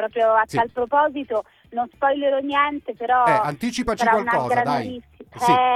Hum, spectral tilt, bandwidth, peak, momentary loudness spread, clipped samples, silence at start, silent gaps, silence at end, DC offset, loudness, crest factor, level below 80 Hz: none; -5 dB/octave; 14.5 kHz; -4 dBFS; 10 LU; under 0.1%; 0 s; none; 0 s; under 0.1%; -21 LUFS; 16 dB; -52 dBFS